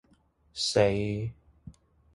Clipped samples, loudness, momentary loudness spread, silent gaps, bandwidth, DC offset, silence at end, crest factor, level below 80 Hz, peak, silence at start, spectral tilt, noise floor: under 0.1%; -28 LUFS; 15 LU; none; 11.5 kHz; under 0.1%; 0.45 s; 22 dB; -54 dBFS; -8 dBFS; 0.55 s; -4.5 dB/octave; -65 dBFS